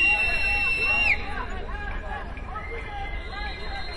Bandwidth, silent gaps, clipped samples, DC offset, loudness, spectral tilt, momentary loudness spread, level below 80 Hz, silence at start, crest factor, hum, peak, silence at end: 11.5 kHz; none; under 0.1%; under 0.1%; -25 LUFS; -4 dB/octave; 15 LU; -34 dBFS; 0 s; 14 dB; none; -12 dBFS; 0 s